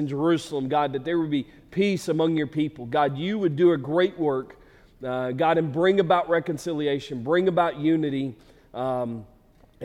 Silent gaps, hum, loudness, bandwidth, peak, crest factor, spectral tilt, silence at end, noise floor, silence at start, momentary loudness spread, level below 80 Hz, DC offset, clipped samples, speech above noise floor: none; none; -24 LUFS; 12.5 kHz; -8 dBFS; 16 dB; -7 dB/octave; 0 s; -52 dBFS; 0 s; 10 LU; -58 dBFS; under 0.1%; under 0.1%; 28 dB